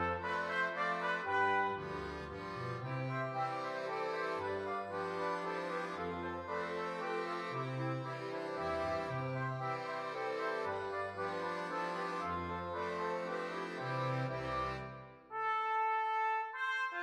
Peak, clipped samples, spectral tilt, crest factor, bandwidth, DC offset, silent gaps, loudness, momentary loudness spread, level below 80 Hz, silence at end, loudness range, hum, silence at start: -22 dBFS; under 0.1%; -6 dB/octave; 16 dB; 11 kHz; under 0.1%; none; -38 LUFS; 7 LU; -64 dBFS; 0 s; 3 LU; none; 0 s